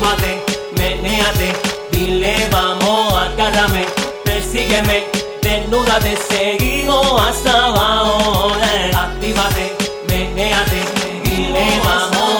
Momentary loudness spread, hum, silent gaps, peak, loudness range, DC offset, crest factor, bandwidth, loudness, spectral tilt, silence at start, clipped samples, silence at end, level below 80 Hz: 6 LU; none; none; 0 dBFS; 2 LU; under 0.1%; 14 dB; over 20 kHz; -15 LUFS; -3.5 dB/octave; 0 s; under 0.1%; 0 s; -26 dBFS